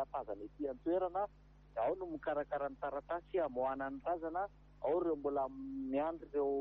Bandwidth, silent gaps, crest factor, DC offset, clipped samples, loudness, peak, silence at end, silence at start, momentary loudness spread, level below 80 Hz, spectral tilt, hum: 5.2 kHz; none; 14 dB; under 0.1%; under 0.1%; -40 LUFS; -26 dBFS; 0 s; 0 s; 7 LU; -64 dBFS; -5.5 dB/octave; 50 Hz at -60 dBFS